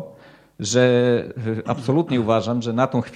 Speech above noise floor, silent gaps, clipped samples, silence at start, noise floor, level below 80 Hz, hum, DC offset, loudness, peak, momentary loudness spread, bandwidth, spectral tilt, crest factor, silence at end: 28 dB; none; under 0.1%; 0 s; -47 dBFS; -58 dBFS; none; under 0.1%; -20 LUFS; -4 dBFS; 10 LU; 10 kHz; -6 dB/octave; 16 dB; 0 s